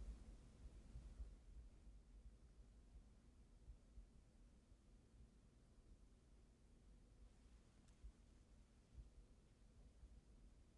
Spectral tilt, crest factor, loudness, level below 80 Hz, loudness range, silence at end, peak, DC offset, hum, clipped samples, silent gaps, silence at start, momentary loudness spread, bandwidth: -6 dB/octave; 18 dB; -66 LUFS; -66 dBFS; 4 LU; 0 s; -46 dBFS; under 0.1%; none; under 0.1%; none; 0 s; 7 LU; 10.5 kHz